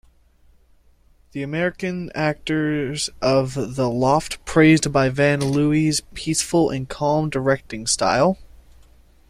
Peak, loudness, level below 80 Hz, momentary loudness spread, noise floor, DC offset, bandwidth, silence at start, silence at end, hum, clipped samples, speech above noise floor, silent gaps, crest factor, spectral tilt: -4 dBFS; -20 LUFS; -46 dBFS; 8 LU; -55 dBFS; under 0.1%; 15 kHz; 1.35 s; 0.85 s; none; under 0.1%; 35 dB; none; 18 dB; -5 dB/octave